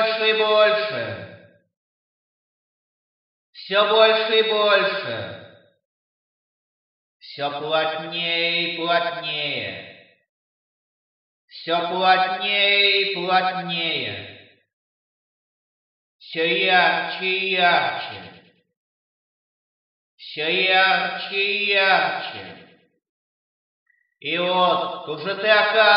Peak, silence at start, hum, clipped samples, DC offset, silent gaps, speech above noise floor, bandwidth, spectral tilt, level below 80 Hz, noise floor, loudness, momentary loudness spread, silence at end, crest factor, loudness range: -2 dBFS; 0 s; none; under 0.1%; under 0.1%; 1.77-3.53 s, 5.85-7.20 s, 10.29-11.48 s, 14.73-16.19 s, 18.77-20.18 s, 23.09-23.86 s; over 70 dB; 5.8 kHz; -6.5 dB/octave; -80 dBFS; under -90 dBFS; -19 LUFS; 16 LU; 0 s; 20 dB; 7 LU